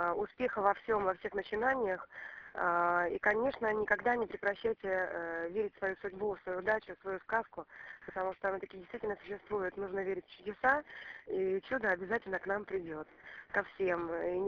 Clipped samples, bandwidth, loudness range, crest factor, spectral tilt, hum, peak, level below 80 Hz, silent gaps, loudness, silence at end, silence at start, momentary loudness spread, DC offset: under 0.1%; 6.8 kHz; 5 LU; 20 dB; -3.5 dB/octave; none; -16 dBFS; -66 dBFS; none; -35 LUFS; 0 s; 0 s; 14 LU; under 0.1%